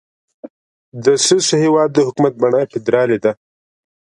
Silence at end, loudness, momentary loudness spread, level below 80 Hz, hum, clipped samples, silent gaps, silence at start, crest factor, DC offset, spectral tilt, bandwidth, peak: 0.8 s; -15 LUFS; 6 LU; -62 dBFS; none; under 0.1%; 0.50-0.92 s; 0.45 s; 16 dB; under 0.1%; -4 dB/octave; 11.5 kHz; 0 dBFS